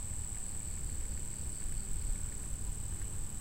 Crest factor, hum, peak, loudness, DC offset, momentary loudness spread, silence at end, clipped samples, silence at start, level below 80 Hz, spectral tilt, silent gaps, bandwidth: 14 dB; none; -24 dBFS; -40 LUFS; 0.7%; 1 LU; 0 s; under 0.1%; 0 s; -40 dBFS; -3.5 dB/octave; none; 16 kHz